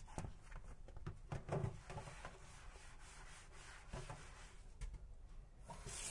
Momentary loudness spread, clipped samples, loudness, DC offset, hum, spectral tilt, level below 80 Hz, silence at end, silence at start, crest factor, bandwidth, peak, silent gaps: 14 LU; under 0.1%; -54 LUFS; under 0.1%; none; -4.5 dB/octave; -56 dBFS; 0 s; 0 s; 22 dB; 11.5 kHz; -30 dBFS; none